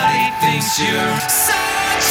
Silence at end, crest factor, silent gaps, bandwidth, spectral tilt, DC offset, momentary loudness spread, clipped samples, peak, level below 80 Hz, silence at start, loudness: 0 s; 14 dB; none; 19 kHz; -2 dB/octave; under 0.1%; 3 LU; under 0.1%; -2 dBFS; -46 dBFS; 0 s; -15 LUFS